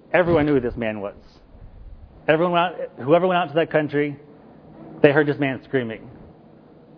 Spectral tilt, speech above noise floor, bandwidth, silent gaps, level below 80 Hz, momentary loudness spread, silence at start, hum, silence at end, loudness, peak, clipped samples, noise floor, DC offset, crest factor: -9.5 dB/octave; 28 dB; 5.4 kHz; none; -48 dBFS; 14 LU; 0.1 s; none; 0.7 s; -21 LUFS; 0 dBFS; under 0.1%; -48 dBFS; under 0.1%; 22 dB